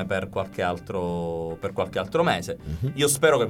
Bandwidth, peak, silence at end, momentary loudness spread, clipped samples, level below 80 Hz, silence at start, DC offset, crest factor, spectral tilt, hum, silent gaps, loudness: 17.5 kHz; -6 dBFS; 0 s; 9 LU; under 0.1%; -48 dBFS; 0 s; under 0.1%; 18 dB; -4 dB/octave; none; none; -26 LUFS